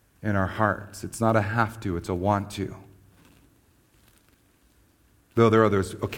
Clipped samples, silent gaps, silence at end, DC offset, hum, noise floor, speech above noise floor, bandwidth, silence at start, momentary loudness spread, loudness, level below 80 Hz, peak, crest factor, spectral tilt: under 0.1%; none; 0 s; under 0.1%; none; -62 dBFS; 37 dB; 16.5 kHz; 0.2 s; 14 LU; -25 LUFS; -54 dBFS; -6 dBFS; 22 dB; -6.5 dB/octave